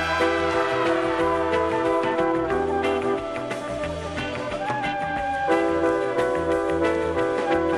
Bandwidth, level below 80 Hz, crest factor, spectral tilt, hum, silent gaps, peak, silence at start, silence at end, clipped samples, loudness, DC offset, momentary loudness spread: 12 kHz; -46 dBFS; 14 dB; -5.5 dB/octave; none; none; -8 dBFS; 0 s; 0 s; under 0.1%; -24 LUFS; under 0.1%; 7 LU